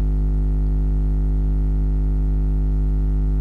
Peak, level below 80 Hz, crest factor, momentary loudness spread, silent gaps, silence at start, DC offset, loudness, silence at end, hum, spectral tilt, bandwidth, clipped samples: -16 dBFS; -18 dBFS; 2 dB; 0 LU; none; 0 s; under 0.1%; -22 LUFS; 0 s; 50 Hz at -20 dBFS; -11 dB/octave; 2 kHz; under 0.1%